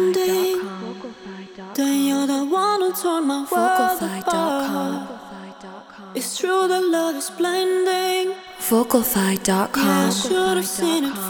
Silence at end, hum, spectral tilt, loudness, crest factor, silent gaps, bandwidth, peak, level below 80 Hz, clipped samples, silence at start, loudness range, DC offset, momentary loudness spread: 0 s; none; -4 dB/octave; -20 LUFS; 18 dB; none; over 20 kHz; -4 dBFS; -58 dBFS; under 0.1%; 0 s; 4 LU; under 0.1%; 17 LU